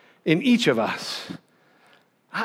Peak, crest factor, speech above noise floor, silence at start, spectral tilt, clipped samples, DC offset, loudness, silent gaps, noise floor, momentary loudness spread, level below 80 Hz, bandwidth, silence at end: -6 dBFS; 20 dB; 37 dB; 0.25 s; -5 dB/octave; under 0.1%; under 0.1%; -23 LUFS; none; -59 dBFS; 17 LU; -78 dBFS; 15.5 kHz; 0 s